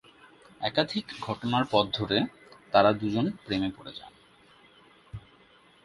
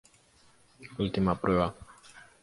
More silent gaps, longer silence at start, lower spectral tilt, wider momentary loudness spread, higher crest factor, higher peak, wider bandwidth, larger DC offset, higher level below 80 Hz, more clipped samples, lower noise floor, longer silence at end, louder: neither; second, 0.6 s vs 0.8 s; about the same, -6.5 dB/octave vs -7.5 dB/octave; second, 22 LU vs 25 LU; first, 26 dB vs 20 dB; first, -4 dBFS vs -12 dBFS; about the same, 11.5 kHz vs 11.5 kHz; neither; second, -60 dBFS vs -50 dBFS; neither; about the same, -59 dBFS vs -62 dBFS; first, 0.65 s vs 0.25 s; about the same, -28 LUFS vs -29 LUFS